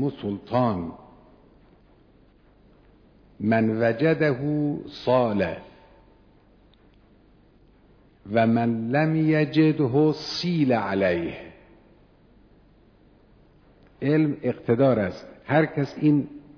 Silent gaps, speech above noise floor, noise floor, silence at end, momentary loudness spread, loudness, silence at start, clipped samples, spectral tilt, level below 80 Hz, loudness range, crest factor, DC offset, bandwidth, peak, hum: none; 34 dB; -56 dBFS; 0.15 s; 10 LU; -23 LUFS; 0 s; under 0.1%; -8 dB/octave; -58 dBFS; 9 LU; 18 dB; under 0.1%; 5.4 kHz; -8 dBFS; none